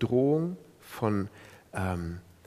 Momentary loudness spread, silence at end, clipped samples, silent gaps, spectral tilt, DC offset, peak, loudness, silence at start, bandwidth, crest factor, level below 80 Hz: 16 LU; 0.25 s; under 0.1%; none; -8 dB/octave; under 0.1%; -12 dBFS; -31 LUFS; 0 s; 15.5 kHz; 18 dB; -60 dBFS